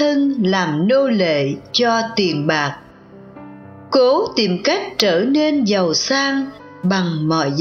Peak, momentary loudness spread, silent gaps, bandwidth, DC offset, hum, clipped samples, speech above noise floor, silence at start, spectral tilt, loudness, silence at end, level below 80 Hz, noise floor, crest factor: 0 dBFS; 5 LU; none; 7.2 kHz; under 0.1%; none; under 0.1%; 24 dB; 0 s; -5 dB/octave; -17 LUFS; 0 s; -60 dBFS; -41 dBFS; 18 dB